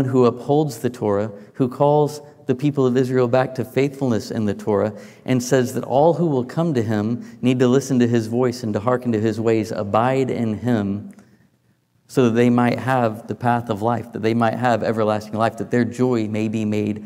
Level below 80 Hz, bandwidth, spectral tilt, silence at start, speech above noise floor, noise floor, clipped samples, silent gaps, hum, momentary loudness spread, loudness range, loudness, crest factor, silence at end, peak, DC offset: -64 dBFS; 16 kHz; -7 dB/octave; 0 s; 43 dB; -62 dBFS; under 0.1%; none; none; 7 LU; 2 LU; -20 LUFS; 16 dB; 0 s; -4 dBFS; under 0.1%